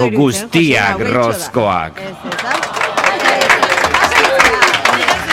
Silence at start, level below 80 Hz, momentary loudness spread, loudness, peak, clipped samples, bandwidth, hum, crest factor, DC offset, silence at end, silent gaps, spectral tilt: 0 s; -44 dBFS; 8 LU; -12 LUFS; 0 dBFS; under 0.1%; 17 kHz; none; 14 dB; under 0.1%; 0 s; none; -3.5 dB/octave